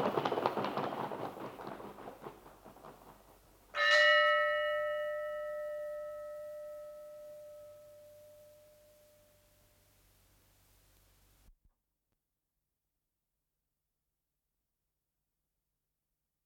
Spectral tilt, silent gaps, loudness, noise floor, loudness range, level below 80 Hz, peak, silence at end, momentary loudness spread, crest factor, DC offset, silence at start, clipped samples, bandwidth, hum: -3.5 dB/octave; none; -32 LUFS; -88 dBFS; 20 LU; -74 dBFS; -10 dBFS; 7.95 s; 28 LU; 28 dB; under 0.1%; 0 s; under 0.1%; 17.5 kHz; none